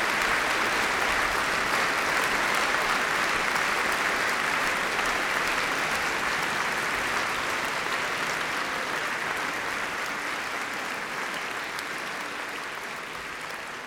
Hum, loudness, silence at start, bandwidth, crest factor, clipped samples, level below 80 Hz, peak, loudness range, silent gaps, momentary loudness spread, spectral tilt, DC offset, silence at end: none; -26 LUFS; 0 s; 19 kHz; 18 dB; under 0.1%; -54 dBFS; -10 dBFS; 7 LU; none; 8 LU; -1.5 dB/octave; under 0.1%; 0 s